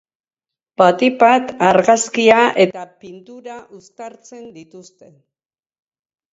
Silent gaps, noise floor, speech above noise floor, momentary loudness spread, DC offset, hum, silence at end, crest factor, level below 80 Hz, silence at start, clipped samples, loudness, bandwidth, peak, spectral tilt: none; under -90 dBFS; over 74 dB; 23 LU; under 0.1%; none; 1.5 s; 18 dB; -64 dBFS; 0.8 s; under 0.1%; -13 LUFS; 8 kHz; 0 dBFS; -4 dB/octave